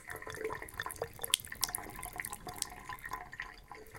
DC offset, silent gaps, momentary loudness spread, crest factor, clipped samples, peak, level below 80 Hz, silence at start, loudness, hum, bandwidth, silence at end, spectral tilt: under 0.1%; none; 12 LU; 36 dB; under 0.1%; -6 dBFS; -58 dBFS; 0 s; -39 LUFS; none; 17 kHz; 0 s; -1 dB/octave